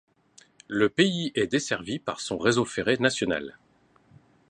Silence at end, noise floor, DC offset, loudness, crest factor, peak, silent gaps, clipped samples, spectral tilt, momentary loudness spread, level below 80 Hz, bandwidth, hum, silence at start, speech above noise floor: 1 s; -61 dBFS; under 0.1%; -26 LUFS; 22 dB; -6 dBFS; none; under 0.1%; -4.5 dB/octave; 9 LU; -60 dBFS; 11 kHz; none; 0.7 s; 36 dB